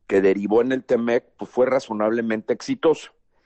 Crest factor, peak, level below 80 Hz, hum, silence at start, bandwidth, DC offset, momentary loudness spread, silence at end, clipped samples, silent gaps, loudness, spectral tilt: 14 dB; -8 dBFS; -62 dBFS; none; 0.1 s; 8.4 kHz; under 0.1%; 6 LU; 0.4 s; under 0.1%; none; -22 LUFS; -6 dB/octave